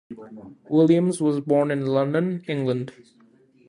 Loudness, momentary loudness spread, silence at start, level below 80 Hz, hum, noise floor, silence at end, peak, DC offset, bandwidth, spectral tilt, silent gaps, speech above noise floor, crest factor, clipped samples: -22 LUFS; 20 LU; 0.1 s; -68 dBFS; none; -56 dBFS; 0.75 s; -6 dBFS; under 0.1%; 11 kHz; -7.5 dB/octave; none; 34 dB; 18 dB; under 0.1%